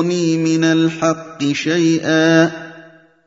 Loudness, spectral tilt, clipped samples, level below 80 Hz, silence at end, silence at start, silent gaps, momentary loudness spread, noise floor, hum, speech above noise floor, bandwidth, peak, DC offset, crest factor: -15 LUFS; -5.5 dB/octave; under 0.1%; -62 dBFS; 0.45 s; 0 s; none; 8 LU; -43 dBFS; none; 28 dB; 7.8 kHz; 0 dBFS; under 0.1%; 16 dB